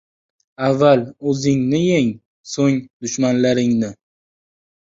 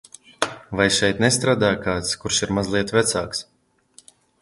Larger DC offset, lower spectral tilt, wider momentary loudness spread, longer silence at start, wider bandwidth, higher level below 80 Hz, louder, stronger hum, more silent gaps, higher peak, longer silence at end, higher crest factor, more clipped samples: neither; first, -6 dB/octave vs -3.5 dB/octave; about the same, 10 LU vs 9 LU; first, 0.6 s vs 0.4 s; second, 7.8 kHz vs 11.5 kHz; second, -56 dBFS vs -48 dBFS; first, -18 LUFS vs -21 LUFS; neither; first, 2.25-2.44 s, 2.90-3.00 s vs none; about the same, -2 dBFS vs 0 dBFS; about the same, 1 s vs 1 s; about the same, 18 dB vs 22 dB; neither